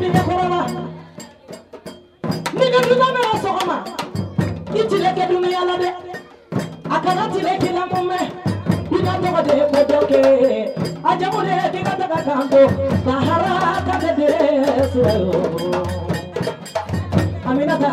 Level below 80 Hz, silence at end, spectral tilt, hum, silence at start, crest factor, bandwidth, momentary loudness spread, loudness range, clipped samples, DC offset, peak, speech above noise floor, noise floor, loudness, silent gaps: -46 dBFS; 0 s; -6.5 dB/octave; none; 0 s; 18 dB; 16 kHz; 12 LU; 4 LU; under 0.1%; under 0.1%; 0 dBFS; 22 dB; -39 dBFS; -18 LUFS; none